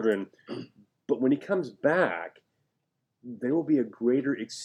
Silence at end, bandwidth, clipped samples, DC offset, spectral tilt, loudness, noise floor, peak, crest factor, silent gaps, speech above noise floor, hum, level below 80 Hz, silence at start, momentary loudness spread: 0 s; 11 kHz; under 0.1%; under 0.1%; -6 dB/octave; -28 LUFS; -80 dBFS; -10 dBFS; 18 dB; none; 53 dB; none; -82 dBFS; 0 s; 15 LU